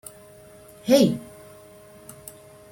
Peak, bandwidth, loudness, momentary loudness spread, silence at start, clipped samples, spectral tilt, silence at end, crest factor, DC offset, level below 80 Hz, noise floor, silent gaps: -4 dBFS; 16.5 kHz; -21 LUFS; 27 LU; 0.85 s; under 0.1%; -5.5 dB/octave; 1.5 s; 22 dB; under 0.1%; -62 dBFS; -48 dBFS; none